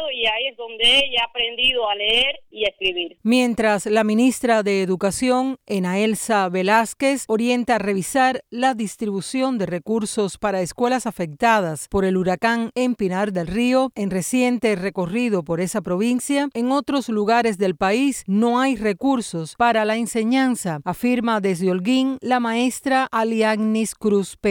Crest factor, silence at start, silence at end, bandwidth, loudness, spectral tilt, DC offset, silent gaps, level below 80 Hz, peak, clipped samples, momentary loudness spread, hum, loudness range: 16 dB; 0 s; 0 s; 17.5 kHz; -20 LUFS; -4 dB/octave; under 0.1%; none; -50 dBFS; -4 dBFS; under 0.1%; 6 LU; none; 3 LU